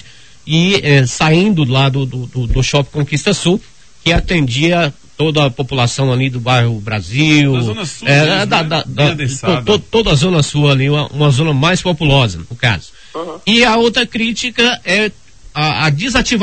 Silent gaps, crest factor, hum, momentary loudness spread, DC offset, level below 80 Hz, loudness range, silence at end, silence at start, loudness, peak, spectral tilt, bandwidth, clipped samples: none; 14 dB; none; 8 LU; 0.9%; -30 dBFS; 2 LU; 0 s; 0.45 s; -13 LUFS; 0 dBFS; -5 dB/octave; 9 kHz; under 0.1%